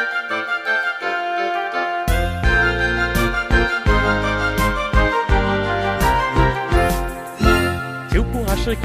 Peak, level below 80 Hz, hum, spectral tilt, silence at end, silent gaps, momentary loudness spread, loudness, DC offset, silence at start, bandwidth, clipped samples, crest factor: -2 dBFS; -24 dBFS; none; -5.5 dB/octave; 0 s; none; 5 LU; -19 LUFS; under 0.1%; 0 s; 15.5 kHz; under 0.1%; 16 dB